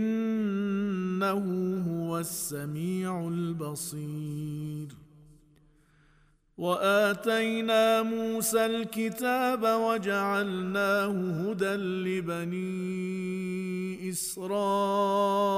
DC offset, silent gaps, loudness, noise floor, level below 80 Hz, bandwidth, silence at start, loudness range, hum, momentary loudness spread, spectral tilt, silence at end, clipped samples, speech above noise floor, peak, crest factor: under 0.1%; none; -29 LUFS; -64 dBFS; -66 dBFS; 15.5 kHz; 0 s; 8 LU; none; 9 LU; -5 dB/octave; 0 s; under 0.1%; 35 dB; -14 dBFS; 16 dB